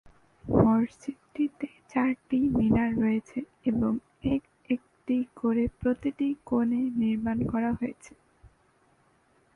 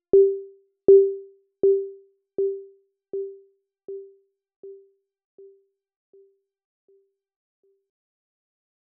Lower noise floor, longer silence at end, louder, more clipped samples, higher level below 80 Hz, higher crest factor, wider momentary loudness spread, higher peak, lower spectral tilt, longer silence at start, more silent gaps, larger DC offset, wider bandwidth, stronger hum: first, -66 dBFS vs -59 dBFS; second, 1.45 s vs 4.15 s; second, -28 LUFS vs -21 LUFS; neither; first, -50 dBFS vs -66 dBFS; about the same, 22 dB vs 20 dB; second, 9 LU vs 24 LU; about the same, -8 dBFS vs -6 dBFS; second, -8.5 dB/octave vs -10.5 dB/octave; first, 0.45 s vs 0.15 s; second, none vs 4.56-4.63 s; neither; first, 9.6 kHz vs 1.2 kHz; neither